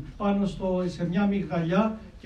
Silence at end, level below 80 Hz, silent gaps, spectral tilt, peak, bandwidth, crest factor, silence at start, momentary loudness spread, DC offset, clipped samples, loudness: 0.05 s; -46 dBFS; none; -8 dB/octave; -10 dBFS; 8.6 kHz; 16 dB; 0 s; 3 LU; under 0.1%; under 0.1%; -27 LUFS